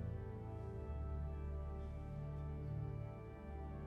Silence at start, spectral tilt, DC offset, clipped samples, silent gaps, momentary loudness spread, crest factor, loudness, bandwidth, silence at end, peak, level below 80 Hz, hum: 0 s; -10 dB/octave; under 0.1%; under 0.1%; none; 5 LU; 10 dB; -48 LUFS; 4.1 kHz; 0 s; -36 dBFS; -50 dBFS; none